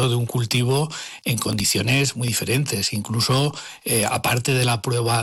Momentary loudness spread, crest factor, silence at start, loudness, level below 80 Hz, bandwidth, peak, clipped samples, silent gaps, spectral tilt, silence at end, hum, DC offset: 5 LU; 10 dB; 0 s; -21 LUFS; -52 dBFS; 17 kHz; -10 dBFS; under 0.1%; none; -4 dB/octave; 0 s; none; under 0.1%